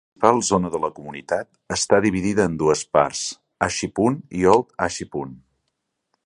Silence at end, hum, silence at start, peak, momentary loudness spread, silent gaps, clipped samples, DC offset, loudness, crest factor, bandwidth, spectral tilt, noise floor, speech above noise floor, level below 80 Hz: 0.9 s; none; 0.2 s; 0 dBFS; 11 LU; none; under 0.1%; under 0.1%; -21 LUFS; 22 dB; 11 kHz; -4.5 dB/octave; -76 dBFS; 56 dB; -48 dBFS